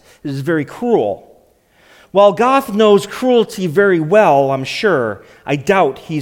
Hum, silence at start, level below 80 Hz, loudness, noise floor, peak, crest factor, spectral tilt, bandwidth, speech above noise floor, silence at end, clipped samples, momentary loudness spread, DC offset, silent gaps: none; 0.25 s; -56 dBFS; -14 LUFS; -52 dBFS; 0 dBFS; 14 dB; -6 dB/octave; 16.5 kHz; 38 dB; 0 s; under 0.1%; 11 LU; under 0.1%; none